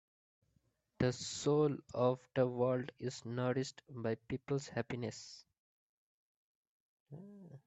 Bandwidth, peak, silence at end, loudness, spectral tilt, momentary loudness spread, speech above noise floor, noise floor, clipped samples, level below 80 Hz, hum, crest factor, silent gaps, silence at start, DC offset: 8.4 kHz; -20 dBFS; 0.1 s; -38 LUFS; -6 dB/octave; 20 LU; 41 dB; -79 dBFS; under 0.1%; -70 dBFS; none; 20 dB; 5.59-7.06 s; 1 s; under 0.1%